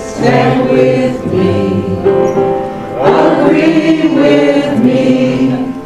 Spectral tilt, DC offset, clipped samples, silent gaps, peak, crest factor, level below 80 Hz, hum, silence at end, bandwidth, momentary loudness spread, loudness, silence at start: -7 dB/octave; 0.5%; 0.3%; none; 0 dBFS; 10 dB; -40 dBFS; none; 0 s; 11 kHz; 5 LU; -10 LUFS; 0 s